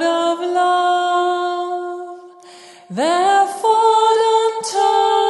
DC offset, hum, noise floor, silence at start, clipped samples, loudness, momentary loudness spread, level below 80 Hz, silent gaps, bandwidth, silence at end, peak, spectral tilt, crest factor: under 0.1%; none; -41 dBFS; 0 s; under 0.1%; -16 LUFS; 12 LU; -82 dBFS; none; 11.5 kHz; 0 s; -2 dBFS; -2.5 dB/octave; 14 dB